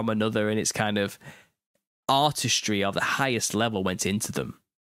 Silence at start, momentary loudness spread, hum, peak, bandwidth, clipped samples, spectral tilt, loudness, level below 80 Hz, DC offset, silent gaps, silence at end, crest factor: 0 s; 10 LU; none; -6 dBFS; 16 kHz; under 0.1%; -3.5 dB/octave; -25 LUFS; -62 dBFS; under 0.1%; 1.66-1.74 s, 1.87-2.03 s; 0.35 s; 20 dB